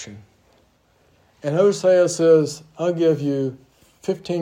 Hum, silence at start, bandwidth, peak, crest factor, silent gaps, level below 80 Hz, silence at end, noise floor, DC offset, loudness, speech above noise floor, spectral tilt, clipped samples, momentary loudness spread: none; 0 s; 14.5 kHz; -4 dBFS; 16 dB; none; -66 dBFS; 0 s; -60 dBFS; under 0.1%; -19 LUFS; 41 dB; -6 dB/octave; under 0.1%; 13 LU